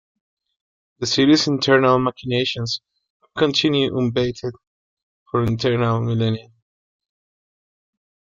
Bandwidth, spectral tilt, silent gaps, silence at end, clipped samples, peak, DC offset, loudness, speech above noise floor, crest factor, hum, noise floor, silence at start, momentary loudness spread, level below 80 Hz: 7.6 kHz; -5.5 dB/octave; 3.10-3.20 s, 4.67-4.97 s, 5.03-5.26 s; 1.85 s; under 0.1%; -2 dBFS; under 0.1%; -19 LUFS; over 71 dB; 18 dB; none; under -90 dBFS; 1 s; 13 LU; -54 dBFS